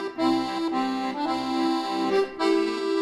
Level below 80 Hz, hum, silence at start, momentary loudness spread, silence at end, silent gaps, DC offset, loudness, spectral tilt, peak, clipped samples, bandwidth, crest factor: -62 dBFS; none; 0 s; 4 LU; 0 s; none; under 0.1%; -25 LUFS; -4.5 dB/octave; -10 dBFS; under 0.1%; 12.5 kHz; 14 dB